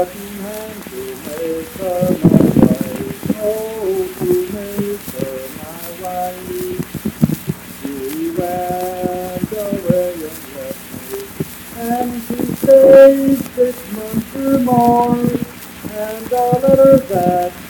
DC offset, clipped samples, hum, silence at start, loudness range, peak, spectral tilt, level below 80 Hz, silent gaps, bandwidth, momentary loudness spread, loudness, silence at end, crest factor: under 0.1%; 0.2%; none; 0 s; 10 LU; 0 dBFS; -6.5 dB/octave; -44 dBFS; none; 19.5 kHz; 17 LU; -15 LUFS; 0 s; 16 dB